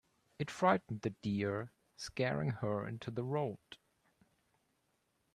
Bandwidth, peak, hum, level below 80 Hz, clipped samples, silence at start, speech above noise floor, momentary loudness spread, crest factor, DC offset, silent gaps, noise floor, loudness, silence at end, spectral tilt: 12.5 kHz; -16 dBFS; none; -72 dBFS; under 0.1%; 0.4 s; 43 dB; 17 LU; 24 dB; under 0.1%; none; -80 dBFS; -38 LUFS; 1.6 s; -6.5 dB/octave